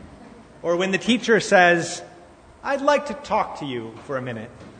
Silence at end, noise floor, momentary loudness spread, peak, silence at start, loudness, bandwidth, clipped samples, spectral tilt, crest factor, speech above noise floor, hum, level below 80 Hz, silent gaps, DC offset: 0 s; -47 dBFS; 17 LU; -2 dBFS; 0 s; -21 LUFS; 9.6 kHz; under 0.1%; -4 dB/octave; 20 dB; 26 dB; none; -56 dBFS; none; under 0.1%